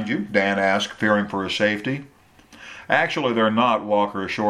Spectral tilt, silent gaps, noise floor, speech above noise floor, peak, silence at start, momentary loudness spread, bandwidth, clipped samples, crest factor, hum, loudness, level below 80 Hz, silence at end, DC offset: -5 dB/octave; none; -50 dBFS; 28 dB; -4 dBFS; 0 s; 8 LU; 13 kHz; under 0.1%; 18 dB; none; -21 LUFS; -60 dBFS; 0 s; under 0.1%